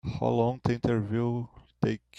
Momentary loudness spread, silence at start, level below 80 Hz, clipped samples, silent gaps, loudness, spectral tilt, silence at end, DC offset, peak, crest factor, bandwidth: 6 LU; 0.05 s; -54 dBFS; under 0.1%; none; -29 LUFS; -8.5 dB/octave; 0.2 s; under 0.1%; -10 dBFS; 20 dB; 8 kHz